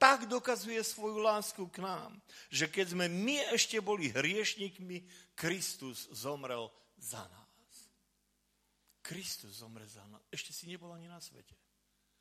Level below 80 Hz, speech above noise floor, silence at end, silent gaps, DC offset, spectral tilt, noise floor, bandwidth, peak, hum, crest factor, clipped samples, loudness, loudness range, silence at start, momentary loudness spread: -80 dBFS; 40 dB; 0.8 s; none; under 0.1%; -2.5 dB/octave; -78 dBFS; 15.5 kHz; -8 dBFS; 50 Hz at -70 dBFS; 30 dB; under 0.1%; -36 LUFS; 13 LU; 0 s; 20 LU